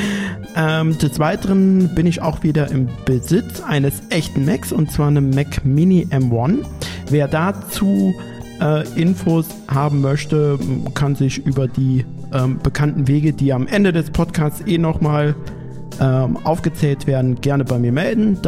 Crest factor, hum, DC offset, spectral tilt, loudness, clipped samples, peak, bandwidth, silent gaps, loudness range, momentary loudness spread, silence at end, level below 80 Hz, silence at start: 14 dB; none; under 0.1%; -7 dB/octave; -18 LUFS; under 0.1%; -2 dBFS; 16 kHz; none; 2 LU; 5 LU; 0 s; -36 dBFS; 0 s